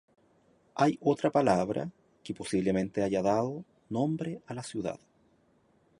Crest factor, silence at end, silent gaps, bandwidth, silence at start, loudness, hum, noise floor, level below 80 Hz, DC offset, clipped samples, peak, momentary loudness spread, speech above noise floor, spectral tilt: 20 dB; 1.05 s; none; 11.5 kHz; 0.75 s; -30 LUFS; none; -67 dBFS; -64 dBFS; under 0.1%; under 0.1%; -10 dBFS; 16 LU; 38 dB; -6.5 dB/octave